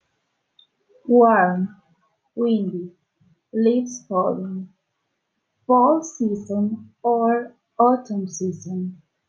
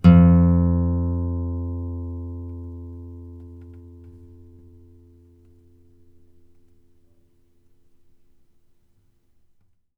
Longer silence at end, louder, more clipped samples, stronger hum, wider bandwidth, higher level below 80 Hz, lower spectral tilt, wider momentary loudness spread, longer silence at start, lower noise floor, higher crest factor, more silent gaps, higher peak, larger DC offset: second, 0.35 s vs 5.9 s; about the same, -21 LUFS vs -21 LUFS; neither; neither; first, 7.4 kHz vs 5 kHz; second, -72 dBFS vs -36 dBFS; second, -6.5 dB/octave vs -11 dB/octave; second, 17 LU vs 28 LU; first, 1.05 s vs 0.05 s; first, -75 dBFS vs -60 dBFS; about the same, 18 dB vs 22 dB; neither; second, -4 dBFS vs 0 dBFS; neither